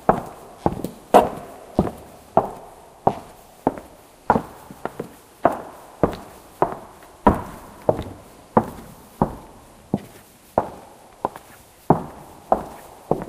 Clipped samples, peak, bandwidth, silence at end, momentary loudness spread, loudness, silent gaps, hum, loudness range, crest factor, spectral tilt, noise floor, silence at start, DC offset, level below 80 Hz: under 0.1%; 0 dBFS; 15.5 kHz; 0 s; 21 LU; -24 LUFS; none; none; 5 LU; 24 dB; -7 dB/octave; -47 dBFS; 0.05 s; under 0.1%; -44 dBFS